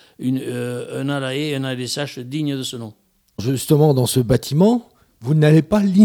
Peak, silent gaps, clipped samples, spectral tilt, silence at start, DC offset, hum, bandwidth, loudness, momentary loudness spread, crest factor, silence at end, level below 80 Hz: -2 dBFS; none; under 0.1%; -6.5 dB/octave; 0.2 s; under 0.1%; none; 18 kHz; -19 LUFS; 13 LU; 16 dB; 0 s; -46 dBFS